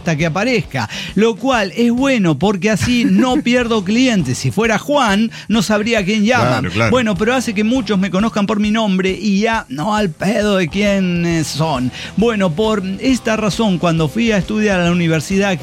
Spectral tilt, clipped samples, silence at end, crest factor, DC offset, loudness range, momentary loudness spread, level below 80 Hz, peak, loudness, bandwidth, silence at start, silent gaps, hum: -5.5 dB/octave; under 0.1%; 0 s; 14 dB; under 0.1%; 2 LU; 4 LU; -38 dBFS; -2 dBFS; -15 LUFS; 15.5 kHz; 0 s; none; none